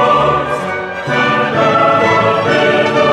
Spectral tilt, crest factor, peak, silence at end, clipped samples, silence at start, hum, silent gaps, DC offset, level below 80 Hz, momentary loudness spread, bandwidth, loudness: -5.5 dB/octave; 12 dB; 0 dBFS; 0 s; under 0.1%; 0 s; none; none; under 0.1%; -44 dBFS; 7 LU; 12 kHz; -12 LUFS